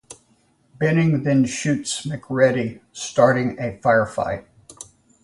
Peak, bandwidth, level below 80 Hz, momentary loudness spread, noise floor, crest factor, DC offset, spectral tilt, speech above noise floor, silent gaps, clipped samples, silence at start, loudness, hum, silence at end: -2 dBFS; 11.5 kHz; -54 dBFS; 14 LU; -61 dBFS; 20 dB; under 0.1%; -5.5 dB/octave; 41 dB; none; under 0.1%; 0.1 s; -20 LUFS; none; 0.4 s